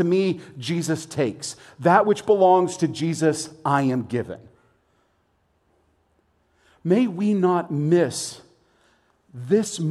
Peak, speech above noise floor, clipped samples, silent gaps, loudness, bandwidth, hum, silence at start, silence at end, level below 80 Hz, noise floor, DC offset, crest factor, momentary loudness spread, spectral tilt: -4 dBFS; 45 dB; under 0.1%; none; -22 LUFS; 13 kHz; none; 0 s; 0 s; -66 dBFS; -67 dBFS; under 0.1%; 20 dB; 14 LU; -6 dB/octave